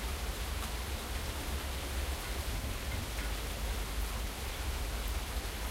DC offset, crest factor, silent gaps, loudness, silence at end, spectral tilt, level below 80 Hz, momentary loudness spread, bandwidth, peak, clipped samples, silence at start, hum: under 0.1%; 12 dB; none; -38 LUFS; 0 s; -3.5 dB/octave; -38 dBFS; 1 LU; 16 kHz; -24 dBFS; under 0.1%; 0 s; none